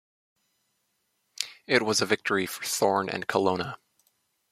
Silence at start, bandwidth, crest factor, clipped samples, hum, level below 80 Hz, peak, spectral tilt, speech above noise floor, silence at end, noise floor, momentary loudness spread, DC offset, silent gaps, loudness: 1.4 s; 16 kHz; 26 dB; under 0.1%; none; -72 dBFS; -4 dBFS; -3 dB/octave; 49 dB; 0.75 s; -75 dBFS; 11 LU; under 0.1%; none; -27 LUFS